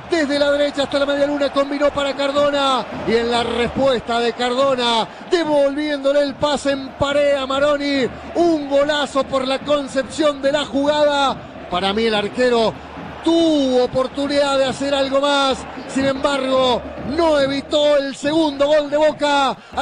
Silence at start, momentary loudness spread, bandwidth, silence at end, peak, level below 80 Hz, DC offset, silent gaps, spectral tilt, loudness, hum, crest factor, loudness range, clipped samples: 0 s; 5 LU; 10.5 kHz; 0 s; -4 dBFS; -46 dBFS; under 0.1%; none; -4 dB/octave; -18 LUFS; none; 12 dB; 1 LU; under 0.1%